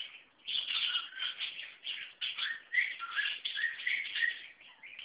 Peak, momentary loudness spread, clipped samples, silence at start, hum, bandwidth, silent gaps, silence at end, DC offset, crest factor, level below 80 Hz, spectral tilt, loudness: -20 dBFS; 14 LU; under 0.1%; 0 s; none; 4 kHz; none; 0 s; under 0.1%; 18 dB; -88 dBFS; 6.5 dB/octave; -34 LUFS